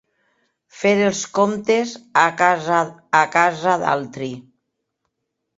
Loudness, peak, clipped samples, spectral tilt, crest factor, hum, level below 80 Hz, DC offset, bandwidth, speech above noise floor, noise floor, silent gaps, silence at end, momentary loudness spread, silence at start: -18 LUFS; 0 dBFS; under 0.1%; -4 dB/octave; 20 dB; none; -64 dBFS; under 0.1%; 8 kHz; 59 dB; -77 dBFS; none; 1.15 s; 9 LU; 0.75 s